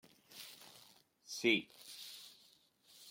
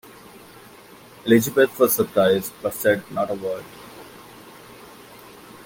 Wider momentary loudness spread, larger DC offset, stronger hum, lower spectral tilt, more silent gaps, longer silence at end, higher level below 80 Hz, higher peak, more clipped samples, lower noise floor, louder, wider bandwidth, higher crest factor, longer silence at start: about the same, 24 LU vs 25 LU; neither; neither; second, -2.5 dB/octave vs -4.5 dB/octave; neither; second, 0 s vs 1.15 s; second, -90 dBFS vs -62 dBFS; second, -20 dBFS vs -2 dBFS; neither; first, -69 dBFS vs -46 dBFS; second, -38 LUFS vs -21 LUFS; about the same, 16.5 kHz vs 17 kHz; about the same, 24 dB vs 20 dB; second, 0.3 s vs 1.25 s